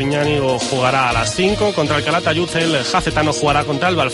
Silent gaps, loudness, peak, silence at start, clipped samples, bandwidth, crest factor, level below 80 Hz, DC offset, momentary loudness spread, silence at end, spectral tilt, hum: none; -16 LUFS; -4 dBFS; 0 s; under 0.1%; 11.5 kHz; 14 dB; -36 dBFS; under 0.1%; 2 LU; 0 s; -4.5 dB/octave; none